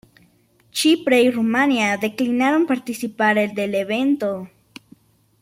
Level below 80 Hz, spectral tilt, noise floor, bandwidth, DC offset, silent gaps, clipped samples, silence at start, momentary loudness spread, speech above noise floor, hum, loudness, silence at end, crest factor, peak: -64 dBFS; -4 dB/octave; -58 dBFS; 16.5 kHz; under 0.1%; none; under 0.1%; 0.75 s; 10 LU; 39 dB; none; -19 LUFS; 0.95 s; 16 dB; -4 dBFS